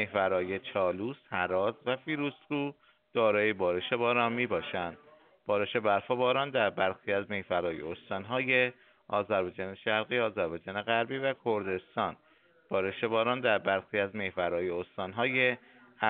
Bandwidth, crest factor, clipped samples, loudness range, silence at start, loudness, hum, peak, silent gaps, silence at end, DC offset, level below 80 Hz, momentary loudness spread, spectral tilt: 4.5 kHz; 20 dB; under 0.1%; 2 LU; 0 s; -31 LUFS; none; -10 dBFS; none; 0 s; under 0.1%; -70 dBFS; 8 LU; -2.5 dB/octave